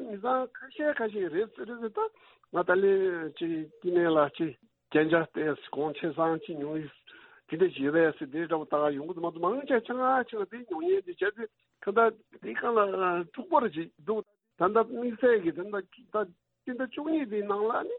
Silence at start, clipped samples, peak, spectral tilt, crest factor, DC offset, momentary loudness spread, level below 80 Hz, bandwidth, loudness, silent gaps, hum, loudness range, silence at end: 0 s; under 0.1%; -10 dBFS; -10 dB/octave; 18 dB; under 0.1%; 11 LU; -76 dBFS; 4.1 kHz; -30 LUFS; none; none; 2 LU; 0 s